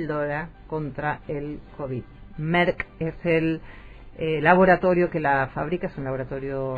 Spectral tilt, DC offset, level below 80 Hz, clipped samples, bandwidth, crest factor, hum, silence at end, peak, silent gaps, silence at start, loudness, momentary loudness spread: -9 dB/octave; under 0.1%; -46 dBFS; under 0.1%; 4.9 kHz; 22 dB; none; 0 s; -2 dBFS; none; 0 s; -24 LUFS; 15 LU